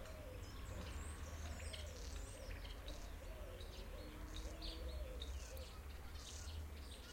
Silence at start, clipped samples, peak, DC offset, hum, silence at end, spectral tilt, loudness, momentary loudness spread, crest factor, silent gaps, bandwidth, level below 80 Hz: 0 s; under 0.1%; -36 dBFS; under 0.1%; none; 0 s; -4 dB/octave; -52 LUFS; 4 LU; 14 dB; none; 16.5 kHz; -52 dBFS